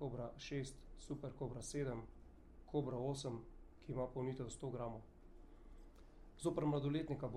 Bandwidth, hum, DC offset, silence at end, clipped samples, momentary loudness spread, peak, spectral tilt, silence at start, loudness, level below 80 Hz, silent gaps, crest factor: 12.5 kHz; none; under 0.1%; 0 s; under 0.1%; 24 LU; -28 dBFS; -6.5 dB/octave; 0 s; -45 LUFS; -60 dBFS; none; 18 dB